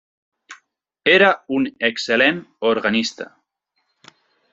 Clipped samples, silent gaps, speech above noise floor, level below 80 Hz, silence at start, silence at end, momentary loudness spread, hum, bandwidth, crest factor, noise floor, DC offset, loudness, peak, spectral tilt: under 0.1%; none; 54 dB; -64 dBFS; 0.5 s; 1.3 s; 11 LU; none; 8 kHz; 20 dB; -72 dBFS; under 0.1%; -18 LUFS; 0 dBFS; -4 dB/octave